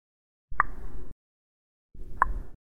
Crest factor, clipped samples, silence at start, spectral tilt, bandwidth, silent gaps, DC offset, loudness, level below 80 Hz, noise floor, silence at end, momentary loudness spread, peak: 26 dB; under 0.1%; 0.5 s; -7 dB/octave; 9.8 kHz; 1.12-1.89 s; under 0.1%; -30 LUFS; -40 dBFS; under -90 dBFS; 0.1 s; 23 LU; -4 dBFS